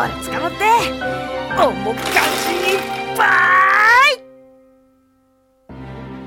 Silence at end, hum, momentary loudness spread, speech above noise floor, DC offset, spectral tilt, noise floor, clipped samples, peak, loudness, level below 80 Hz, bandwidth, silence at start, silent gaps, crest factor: 0 s; none; 14 LU; 41 dB; under 0.1%; -3 dB/octave; -58 dBFS; under 0.1%; -2 dBFS; -15 LUFS; -46 dBFS; 17.5 kHz; 0 s; none; 16 dB